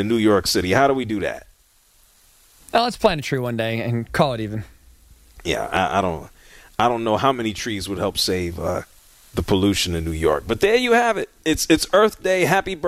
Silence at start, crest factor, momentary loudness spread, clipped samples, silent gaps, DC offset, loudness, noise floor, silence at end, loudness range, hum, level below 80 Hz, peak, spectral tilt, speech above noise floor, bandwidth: 0 s; 20 dB; 10 LU; under 0.1%; none; under 0.1%; -20 LUFS; -57 dBFS; 0 s; 5 LU; none; -42 dBFS; 0 dBFS; -4.5 dB/octave; 37 dB; 16 kHz